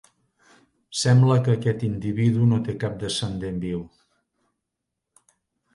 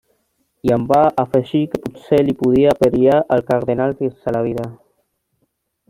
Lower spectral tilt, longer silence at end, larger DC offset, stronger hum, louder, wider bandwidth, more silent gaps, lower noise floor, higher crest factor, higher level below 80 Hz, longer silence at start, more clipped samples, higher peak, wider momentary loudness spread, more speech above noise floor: second, -6.5 dB/octave vs -8 dB/octave; first, 1.9 s vs 1.15 s; neither; neither; second, -23 LUFS vs -17 LUFS; second, 11.5 kHz vs 16 kHz; neither; first, -83 dBFS vs -69 dBFS; about the same, 18 dB vs 16 dB; about the same, -52 dBFS vs -48 dBFS; first, 0.9 s vs 0.65 s; neither; second, -8 dBFS vs -2 dBFS; about the same, 12 LU vs 10 LU; first, 61 dB vs 53 dB